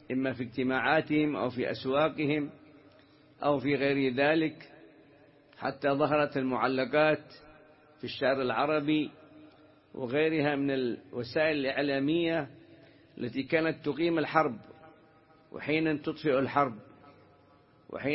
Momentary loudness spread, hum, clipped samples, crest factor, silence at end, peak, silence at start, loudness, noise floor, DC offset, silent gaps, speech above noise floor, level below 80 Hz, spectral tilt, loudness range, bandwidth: 12 LU; none; under 0.1%; 22 dB; 0 s; -8 dBFS; 0.1 s; -30 LUFS; -61 dBFS; under 0.1%; none; 32 dB; -68 dBFS; -10 dB/octave; 2 LU; 5.8 kHz